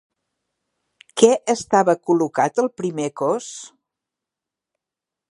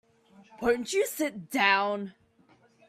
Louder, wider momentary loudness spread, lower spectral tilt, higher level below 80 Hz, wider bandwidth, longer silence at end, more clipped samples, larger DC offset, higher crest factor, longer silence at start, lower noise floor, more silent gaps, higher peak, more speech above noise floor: first, -19 LUFS vs -27 LUFS; about the same, 12 LU vs 10 LU; first, -4.5 dB/octave vs -3 dB/octave; about the same, -68 dBFS vs -64 dBFS; second, 11.5 kHz vs 16 kHz; first, 1.65 s vs 0.8 s; neither; neither; about the same, 22 dB vs 22 dB; first, 1.15 s vs 0.55 s; first, -87 dBFS vs -63 dBFS; neither; first, 0 dBFS vs -8 dBFS; first, 68 dB vs 35 dB